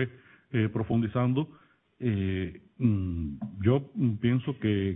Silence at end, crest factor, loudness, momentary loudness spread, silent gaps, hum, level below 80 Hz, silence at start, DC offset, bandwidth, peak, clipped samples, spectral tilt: 0 s; 18 dB; -29 LUFS; 8 LU; none; none; -52 dBFS; 0 s; under 0.1%; 3.9 kHz; -10 dBFS; under 0.1%; -12 dB/octave